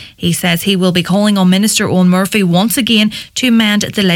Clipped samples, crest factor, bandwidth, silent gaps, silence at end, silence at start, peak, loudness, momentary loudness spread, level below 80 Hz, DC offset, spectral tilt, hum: under 0.1%; 12 dB; 17.5 kHz; none; 0 s; 0 s; 0 dBFS; -11 LUFS; 3 LU; -48 dBFS; under 0.1%; -4.5 dB/octave; none